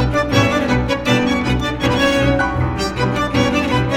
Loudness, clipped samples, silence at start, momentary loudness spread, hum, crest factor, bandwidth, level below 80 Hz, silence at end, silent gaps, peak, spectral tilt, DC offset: -16 LUFS; under 0.1%; 0 s; 4 LU; none; 14 dB; 15.5 kHz; -28 dBFS; 0 s; none; -2 dBFS; -5.5 dB/octave; under 0.1%